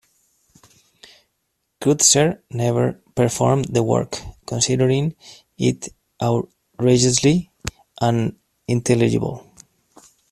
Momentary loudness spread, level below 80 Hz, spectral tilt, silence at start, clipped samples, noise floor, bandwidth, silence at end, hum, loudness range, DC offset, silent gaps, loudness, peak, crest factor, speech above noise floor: 16 LU; -48 dBFS; -4.5 dB/octave; 1.8 s; under 0.1%; -73 dBFS; 14 kHz; 0.9 s; none; 3 LU; under 0.1%; none; -19 LUFS; 0 dBFS; 20 dB; 54 dB